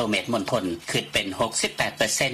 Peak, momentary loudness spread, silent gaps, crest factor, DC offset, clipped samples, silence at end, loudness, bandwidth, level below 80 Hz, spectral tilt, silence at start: -6 dBFS; 4 LU; none; 20 dB; under 0.1%; under 0.1%; 0 s; -25 LUFS; 15.5 kHz; -54 dBFS; -2.5 dB/octave; 0 s